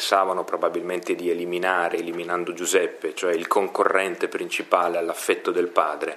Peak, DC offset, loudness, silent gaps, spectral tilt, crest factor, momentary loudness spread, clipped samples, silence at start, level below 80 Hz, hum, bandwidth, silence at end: 0 dBFS; under 0.1%; -24 LUFS; none; -2.5 dB/octave; 22 dB; 6 LU; under 0.1%; 0 s; -80 dBFS; none; 15.5 kHz; 0 s